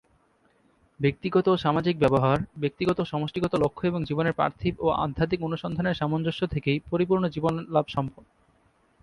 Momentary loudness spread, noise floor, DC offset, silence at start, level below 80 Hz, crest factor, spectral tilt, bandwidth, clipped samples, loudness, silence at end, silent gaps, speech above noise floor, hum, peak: 6 LU; -65 dBFS; under 0.1%; 1 s; -50 dBFS; 18 dB; -8 dB/octave; 11 kHz; under 0.1%; -26 LUFS; 0.9 s; none; 39 dB; none; -8 dBFS